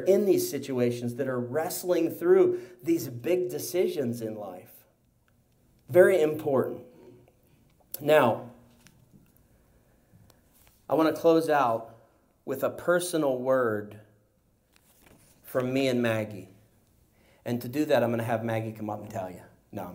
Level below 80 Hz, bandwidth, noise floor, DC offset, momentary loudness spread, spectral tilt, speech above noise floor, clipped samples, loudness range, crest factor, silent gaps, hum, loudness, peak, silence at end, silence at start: -70 dBFS; 16 kHz; -67 dBFS; under 0.1%; 17 LU; -5.5 dB/octave; 41 dB; under 0.1%; 5 LU; 22 dB; none; none; -27 LUFS; -6 dBFS; 0 s; 0 s